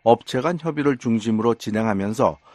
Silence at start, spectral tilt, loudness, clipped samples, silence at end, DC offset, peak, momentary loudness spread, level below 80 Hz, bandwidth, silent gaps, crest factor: 0.05 s; -6.5 dB/octave; -22 LUFS; under 0.1%; 0.2 s; under 0.1%; 0 dBFS; 3 LU; -56 dBFS; 12.5 kHz; none; 20 dB